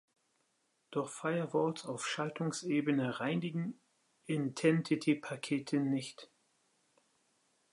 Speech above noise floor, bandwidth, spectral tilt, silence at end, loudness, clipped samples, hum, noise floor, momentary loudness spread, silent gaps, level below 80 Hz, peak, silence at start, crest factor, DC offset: 44 dB; 11.5 kHz; -5.5 dB/octave; 1.5 s; -35 LUFS; under 0.1%; none; -78 dBFS; 8 LU; none; -84 dBFS; -16 dBFS; 0.9 s; 20 dB; under 0.1%